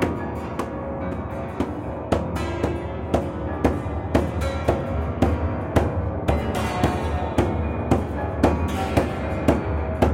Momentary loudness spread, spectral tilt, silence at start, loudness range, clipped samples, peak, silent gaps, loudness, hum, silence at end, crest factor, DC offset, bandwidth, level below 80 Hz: 7 LU; -7.5 dB/octave; 0 s; 3 LU; under 0.1%; -6 dBFS; none; -24 LUFS; none; 0 s; 18 dB; under 0.1%; 16 kHz; -32 dBFS